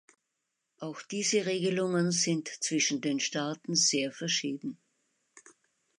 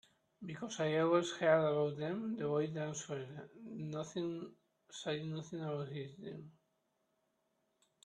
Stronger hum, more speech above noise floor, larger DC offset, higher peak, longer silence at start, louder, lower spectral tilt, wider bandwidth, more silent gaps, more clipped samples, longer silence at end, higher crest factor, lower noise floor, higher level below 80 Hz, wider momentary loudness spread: neither; first, 53 dB vs 44 dB; neither; about the same, -14 dBFS vs -16 dBFS; first, 0.8 s vs 0.4 s; first, -29 LUFS vs -38 LUFS; second, -3 dB/octave vs -5.5 dB/octave; about the same, 11.5 kHz vs 10.5 kHz; neither; neither; second, 0.6 s vs 1.55 s; about the same, 18 dB vs 22 dB; about the same, -83 dBFS vs -81 dBFS; about the same, -82 dBFS vs -80 dBFS; second, 13 LU vs 18 LU